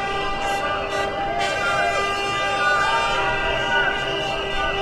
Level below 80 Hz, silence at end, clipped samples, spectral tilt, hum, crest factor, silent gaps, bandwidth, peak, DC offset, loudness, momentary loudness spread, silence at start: -38 dBFS; 0 s; under 0.1%; -3 dB/octave; none; 14 dB; none; 14 kHz; -8 dBFS; under 0.1%; -21 LUFS; 5 LU; 0 s